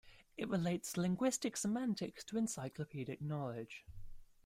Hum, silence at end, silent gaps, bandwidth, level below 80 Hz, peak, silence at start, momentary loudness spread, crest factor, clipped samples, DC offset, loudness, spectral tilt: none; 0.2 s; none; 16 kHz; -62 dBFS; -22 dBFS; 0.05 s; 13 LU; 18 dB; under 0.1%; under 0.1%; -40 LUFS; -5 dB/octave